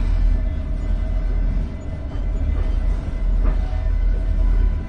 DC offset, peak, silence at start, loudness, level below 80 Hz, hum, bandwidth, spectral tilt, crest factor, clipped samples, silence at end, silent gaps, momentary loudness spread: under 0.1%; -6 dBFS; 0 s; -24 LUFS; -20 dBFS; none; 4.5 kHz; -8.5 dB/octave; 12 dB; under 0.1%; 0 s; none; 5 LU